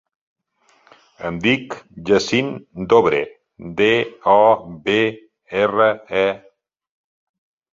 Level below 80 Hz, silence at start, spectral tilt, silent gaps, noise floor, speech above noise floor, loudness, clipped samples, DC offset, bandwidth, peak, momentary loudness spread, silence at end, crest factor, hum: -54 dBFS; 1.2 s; -5 dB/octave; none; -60 dBFS; 42 dB; -18 LUFS; under 0.1%; under 0.1%; 7.6 kHz; 0 dBFS; 16 LU; 1.35 s; 18 dB; none